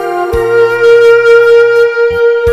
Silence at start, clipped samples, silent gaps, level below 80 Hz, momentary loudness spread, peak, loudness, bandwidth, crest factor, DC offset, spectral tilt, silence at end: 0 s; 3%; none; -32 dBFS; 6 LU; 0 dBFS; -7 LUFS; 13 kHz; 6 dB; under 0.1%; -5 dB/octave; 0 s